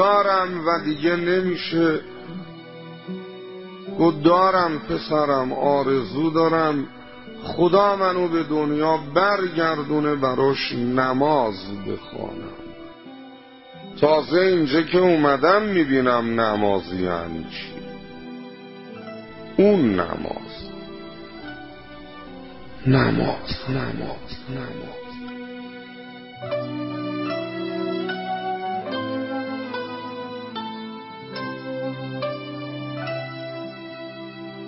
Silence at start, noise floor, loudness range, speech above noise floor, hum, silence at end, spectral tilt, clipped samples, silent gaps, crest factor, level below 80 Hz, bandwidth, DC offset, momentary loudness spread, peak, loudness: 0 s; -44 dBFS; 11 LU; 23 dB; none; 0 s; -10.5 dB/octave; under 0.1%; none; 20 dB; -52 dBFS; 5.8 kHz; under 0.1%; 20 LU; -4 dBFS; -22 LUFS